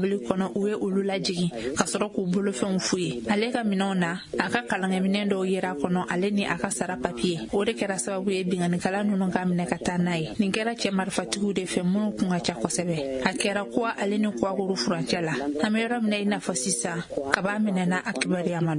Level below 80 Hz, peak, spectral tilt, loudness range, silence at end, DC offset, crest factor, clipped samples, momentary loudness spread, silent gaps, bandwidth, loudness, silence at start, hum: -58 dBFS; 0 dBFS; -5 dB/octave; 1 LU; 0 s; under 0.1%; 26 dB; under 0.1%; 2 LU; none; 11 kHz; -26 LUFS; 0 s; none